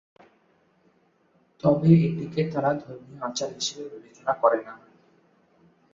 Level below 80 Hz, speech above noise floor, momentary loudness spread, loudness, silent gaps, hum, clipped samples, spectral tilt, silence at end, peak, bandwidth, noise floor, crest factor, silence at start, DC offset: -62 dBFS; 40 dB; 19 LU; -25 LUFS; none; none; under 0.1%; -6.5 dB/octave; 1.15 s; -6 dBFS; 7.6 kHz; -65 dBFS; 22 dB; 1.65 s; under 0.1%